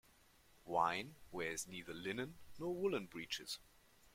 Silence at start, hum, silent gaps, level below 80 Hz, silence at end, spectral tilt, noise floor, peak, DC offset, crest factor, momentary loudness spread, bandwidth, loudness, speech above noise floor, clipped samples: 0.55 s; none; none; -70 dBFS; 0.45 s; -3.5 dB/octave; -69 dBFS; -22 dBFS; under 0.1%; 22 dB; 12 LU; 16.5 kHz; -43 LUFS; 26 dB; under 0.1%